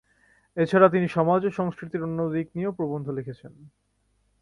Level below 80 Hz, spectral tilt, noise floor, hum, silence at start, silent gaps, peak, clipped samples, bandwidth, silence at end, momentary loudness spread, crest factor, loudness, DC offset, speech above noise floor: -62 dBFS; -8.5 dB/octave; -69 dBFS; 50 Hz at -55 dBFS; 0.55 s; none; -4 dBFS; under 0.1%; 11 kHz; 0.75 s; 15 LU; 22 dB; -25 LUFS; under 0.1%; 45 dB